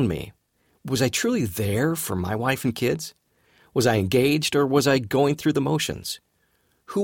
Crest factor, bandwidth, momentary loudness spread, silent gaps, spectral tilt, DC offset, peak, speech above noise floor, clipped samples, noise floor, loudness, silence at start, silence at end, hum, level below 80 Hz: 16 dB; 18 kHz; 12 LU; none; -5 dB/octave; under 0.1%; -8 dBFS; 45 dB; under 0.1%; -67 dBFS; -23 LUFS; 0 s; 0 s; none; -52 dBFS